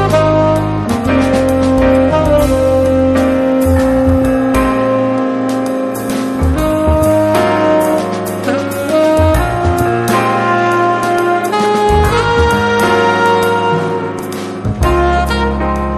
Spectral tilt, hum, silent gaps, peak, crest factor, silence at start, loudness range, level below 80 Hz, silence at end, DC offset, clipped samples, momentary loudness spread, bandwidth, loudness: -6.5 dB/octave; none; none; 0 dBFS; 12 dB; 0 s; 2 LU; -24 dBFS; 0 s; under 0.1%; under 0.1%; 6 LU; 13.5 kHz; -12 LUFS